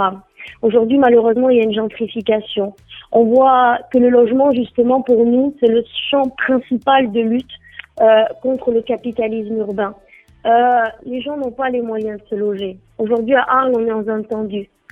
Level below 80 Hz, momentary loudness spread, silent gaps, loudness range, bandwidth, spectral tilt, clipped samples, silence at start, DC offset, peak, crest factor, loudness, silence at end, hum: -54 dBFS; 12 LU; none; 5 LU; 3.9 kHz; -7.5 dB/octave; under 0.1%; 0 s; under 0.1%; 0 dBFS; 16 dB; -16 LUFS; 0.25 s; none